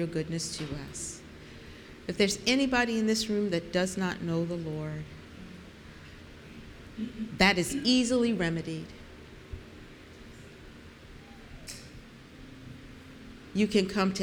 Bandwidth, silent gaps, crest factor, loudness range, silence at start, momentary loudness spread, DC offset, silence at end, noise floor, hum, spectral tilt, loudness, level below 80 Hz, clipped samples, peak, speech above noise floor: 18.5 kHz; none; 24 dB; 19 LU; 0 s; 24 LU; under 0.1%; 0 s; -49 dBFS; none; -4.5 dB/octave; -29 LUFS; -52 dBFS; under 0.1%; -8 dBFS; 20 dB